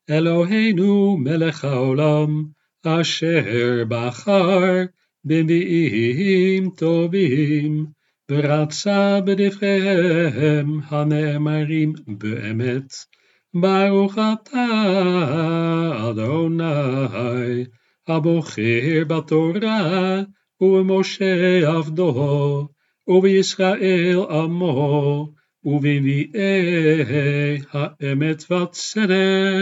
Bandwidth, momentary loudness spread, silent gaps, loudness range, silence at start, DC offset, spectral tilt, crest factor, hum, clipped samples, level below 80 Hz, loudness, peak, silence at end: 8 kHz; 8 LU; none; 3 LU; 0.1 s; under 0.1%; -6.5 dB/octave; 16 dB; none; under 0.1%; -78 dBFS; -19 LUFS; -4 dBFS; 0 s